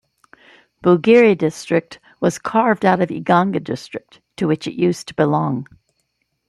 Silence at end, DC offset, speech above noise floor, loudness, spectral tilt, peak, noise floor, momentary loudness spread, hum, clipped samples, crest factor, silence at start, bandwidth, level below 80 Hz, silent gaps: 0.85 s; under 0.1%; 53 dB; -18 LUFS; -6.5 dB/octave; -2 dBFS; -70 dBFS; 13 LU; none; under 0.1%; 16 dB; 0.85 s; 12.5 kHz; -60 dBFS; none